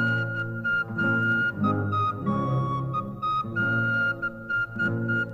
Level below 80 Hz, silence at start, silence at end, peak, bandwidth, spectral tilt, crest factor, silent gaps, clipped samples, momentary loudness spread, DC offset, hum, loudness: -56 dBFS; 0 s; 0 s; -12 dBFS; 7.6 kHz; -8 dB/octave; 14 dB; none; under 0.1%; 5 LU; under 0.1%; none; -26 LUFS